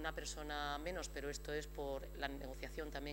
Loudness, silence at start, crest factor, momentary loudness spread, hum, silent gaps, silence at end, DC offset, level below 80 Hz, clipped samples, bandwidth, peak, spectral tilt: -45 LUFS; 0 s; 22 dB; 4 LU; none; none; 0 s; under 0.1%; -52 dBFS; under 0.1%; 16 kHz; -24 dBFS; -3.5 dB/octave